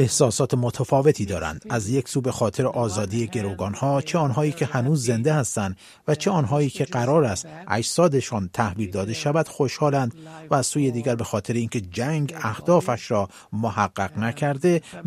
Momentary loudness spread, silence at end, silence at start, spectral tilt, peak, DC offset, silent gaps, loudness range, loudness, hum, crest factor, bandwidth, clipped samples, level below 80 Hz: 7 LU; 0 s; 0 s; -5.5 dB/octave; -4 dBFS; under 0.1%; none; 2 LU; -23 LUFS; none; 20 dB; 15 kHz; under 0.1%; -54 dBFS